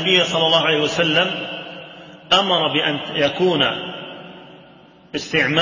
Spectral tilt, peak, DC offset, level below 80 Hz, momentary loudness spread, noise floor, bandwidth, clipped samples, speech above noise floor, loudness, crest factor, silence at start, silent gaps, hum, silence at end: -4 dB/octave; -2 dBFS; under 0.1%; -58 dBFS; 19 LU; -47 dBFS; 7.6 kHz; under 0.1%; 29 dB; -17 LUFS; 18 dB; 0 s; none; none; 0 s